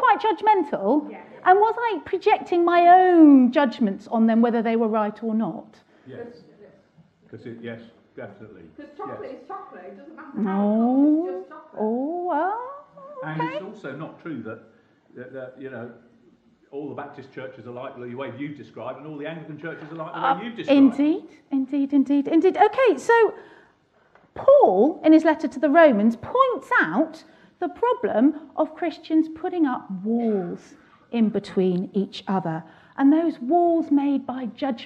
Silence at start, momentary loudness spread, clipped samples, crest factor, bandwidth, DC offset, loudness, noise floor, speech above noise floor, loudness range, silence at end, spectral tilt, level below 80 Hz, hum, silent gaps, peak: 0 s; 22 LU; under 0.1%; 18 dB; 8.4 kHz; under 0.1%; -21 LUFS; -60 dBFS; 39 dB; 20 LU; 0 s; -7.5 dB/octave; -70 dBFS; none; none; -4 dBFS